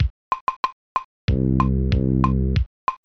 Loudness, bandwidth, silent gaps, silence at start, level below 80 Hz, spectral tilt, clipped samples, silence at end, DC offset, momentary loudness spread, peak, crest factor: -23 LUFS; 6.2 kHz; 0.10-0.31 s, 0.41-0.47 s, 0.56-0.63 s, 0.72-0.95 s, 1.04-1.28 s, 2.66-2.87 s; 0 s; -26 dBFS; -9 dB/octave; under 0.1%; 0.1 s; under 0.1%; 8 LU; -4 dBFS; 18 dB